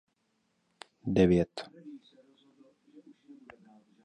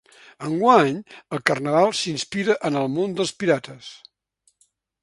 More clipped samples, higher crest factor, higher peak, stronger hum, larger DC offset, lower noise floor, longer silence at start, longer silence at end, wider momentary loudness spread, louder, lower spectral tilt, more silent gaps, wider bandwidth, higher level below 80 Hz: neither; about the same, 22 dB vs 22 dB; second, -12 dBFS vs 0 dBFS; neither; neither; first, -77 dBFS vs -67 dBFS; first, 1.05 s vs 0.4 s; first, 2.05 s vs 1.05 s; first, 29 LU vs 17 LU; second, -28 LUFS vs -21 LUFS; first, -8 dB/octave vs -4.5 dB/octave; neither; second, 9.8 kHz vs 11.5 kHz; first, -56 dBFS vs -66 dBFS